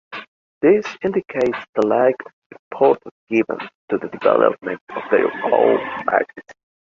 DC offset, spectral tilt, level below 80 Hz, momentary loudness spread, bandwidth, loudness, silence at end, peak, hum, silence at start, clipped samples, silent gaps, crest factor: under 0.1%; -7 dB/octave; -62 dBFS; 13 LU; 7.2 kHz; -19 LUFS; 0.4 s; -2 dBFS; none; 0.1 s; under 0.1%; 0.28-0.61 s, 1.69-1.73 s, 2.33-2.50 s, 2.59-2.71 s, 3.11-3.27 s, 3.75-3.88 s, 4.81-4.87 s; 18 dB